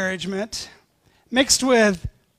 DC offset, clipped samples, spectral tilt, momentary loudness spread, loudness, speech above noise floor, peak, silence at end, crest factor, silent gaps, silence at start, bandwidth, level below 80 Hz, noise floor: under 0.1%; under 0.1%; -2.5 dB/octave; 16 LU; -20 LUFS; 40 dB; -4 dBFS; 0.3 s; 18 dB; none; 0 s; 15.5 kHz; -46 dBFS; -61 dBFS